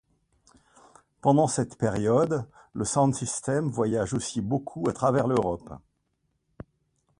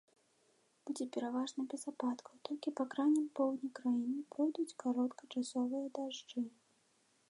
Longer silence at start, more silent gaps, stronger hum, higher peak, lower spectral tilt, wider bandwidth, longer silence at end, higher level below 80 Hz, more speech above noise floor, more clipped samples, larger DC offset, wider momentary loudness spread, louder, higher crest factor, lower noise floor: first, 1.25 s vs 0.85 s; neither; neither; first, -8 dBFS vs -24 dBFS; first, -6 dB/octave vs -4 dB/octave; about the same, 11.5 kHz vs 11 kHz; first, 1.45 s vs 0.8 s; first, -56 dBFS vs under -90 dBFS; first, 50 dB vs 37 dB; neither; neither; about the same, 9 LU vs 9 LU; first, -26 LUFS vs -39 LUFS; about the same, 20 dB vs 16 dB; about the same, -75 dBFS vs -75 dBFS